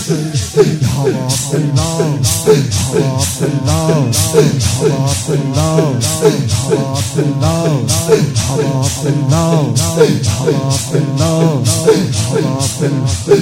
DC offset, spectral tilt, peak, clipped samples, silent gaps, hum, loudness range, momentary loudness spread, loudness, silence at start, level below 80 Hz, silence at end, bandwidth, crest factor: under 0.1%; -5 dB/octave; 0 dBFS; 0.1%; none; none; 1 LU; 4 LU; -13 LUFS; 0 s; -36 dBFS; 0 s; 16.5 kHz; 12 dB